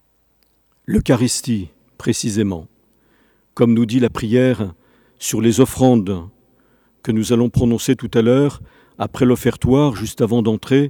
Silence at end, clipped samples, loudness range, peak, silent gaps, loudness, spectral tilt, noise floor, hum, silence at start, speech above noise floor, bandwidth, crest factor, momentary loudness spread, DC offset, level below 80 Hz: 0 s; under 0.1%; 3 LU; 0 dBFS; none; -17 LUFS; -6 dB/octave; -60 dBFS; none; 0.9 s; 45 dB; 19 kHz; 18 dB; 12 LU; under 0.1%; -40 dBFS